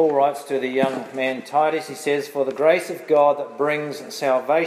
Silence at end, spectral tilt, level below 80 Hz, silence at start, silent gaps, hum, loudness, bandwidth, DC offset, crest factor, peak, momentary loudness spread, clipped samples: 0 s; -4.5 dB/octave; -78 dBFS; 0 s; none; none; -21 LUFS; 16 kHz; under 0.1%; 16 dB; -4 dBFS; 8 LU; under 0.1%